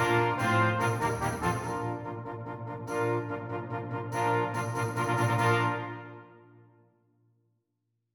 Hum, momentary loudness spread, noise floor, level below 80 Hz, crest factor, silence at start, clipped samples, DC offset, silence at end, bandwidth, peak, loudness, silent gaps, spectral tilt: none; 13 LU; -81 dBFS; -58 dBFS; 18 dB; 0 s; under 0.1%; under 0.1%; 1.75 s; 18.5 kHz; -14 dBFS; -30 LUFS; none; -6 dB/octave